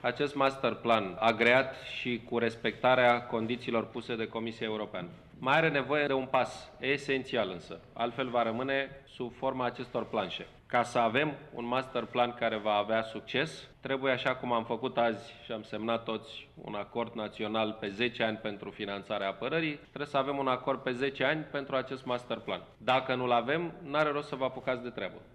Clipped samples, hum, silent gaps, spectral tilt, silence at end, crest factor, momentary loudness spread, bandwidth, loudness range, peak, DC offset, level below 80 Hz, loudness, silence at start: under 0.1%; none; none; -5.5 dB/octave; 0.05 s; 20 dB; 12 LU; 11.5 kHz; 6 LU; -12 dBFS; under 0.1%; -64 dBFS; -32 LUFS; 0 s